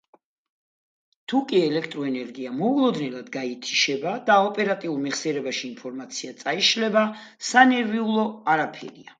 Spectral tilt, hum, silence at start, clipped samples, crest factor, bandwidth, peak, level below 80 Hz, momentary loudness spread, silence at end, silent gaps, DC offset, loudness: -3.5 dB/octave; none; 1.3 s; under 0.1%; 24 dB; 9.4 kHz; 0 dBFS; -76 dBFS; 13 LU; 0.2 s; none; under 0.1%; -23 LUFS